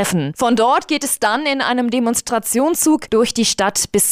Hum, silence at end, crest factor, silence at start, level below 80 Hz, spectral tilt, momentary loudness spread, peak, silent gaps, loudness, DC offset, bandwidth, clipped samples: none; 0 s; 10 dB; 0 s; -50 dBFS; -3 dB/octave; 3 LU; -6 dBFS; none; -16 LUFS; under 0.1%; 16 kHz; under 0.1%